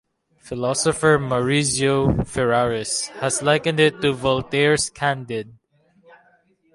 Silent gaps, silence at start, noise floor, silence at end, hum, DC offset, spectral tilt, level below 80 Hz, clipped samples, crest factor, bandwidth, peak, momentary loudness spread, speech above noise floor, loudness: none; 0.45 s; -60 dBFS; 1.25 s; none; under 0.1%; -4 dB/octave; -44 dBFS; under 0.1%; 16 dB; 11.5 kHz; -4 dBFS; 8 LU; 40 dB; -20 LUFS